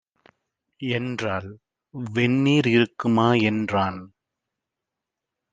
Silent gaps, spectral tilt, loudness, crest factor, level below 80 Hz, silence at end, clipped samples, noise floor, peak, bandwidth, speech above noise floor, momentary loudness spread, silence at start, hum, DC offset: none; -6.5 dB/octave; -22 LUFS; 20 dB; -64 dBFS; 1.45 s; under 0.1%; -85 dBFS; -4 dBFS; 9.2 kHz; 63 dB; 16 LU; 0.8 s; none; under 0.1%